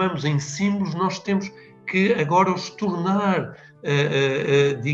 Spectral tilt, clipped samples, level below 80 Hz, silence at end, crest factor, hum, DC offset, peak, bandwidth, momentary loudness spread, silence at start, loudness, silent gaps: -6 dB/octave; under 0.1%; -66 dBFS; 0 s; 16 dB; none; under 0.1%; -6 dBFS; 8 kHz; 7 LU; 0 s; -22 LUFS; none